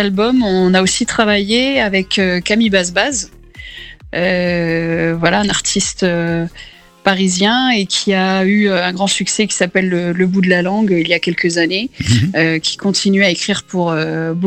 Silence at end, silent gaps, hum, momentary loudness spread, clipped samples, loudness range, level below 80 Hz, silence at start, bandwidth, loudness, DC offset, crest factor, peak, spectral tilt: 0 s; none; none; 6 LU; under 0.1%; 2 LU; -42 dBFS; 0 s; 11 kHz; -14 LUFS; under 0.1%; 14 dB; 0 dBFS; -4 dB/octave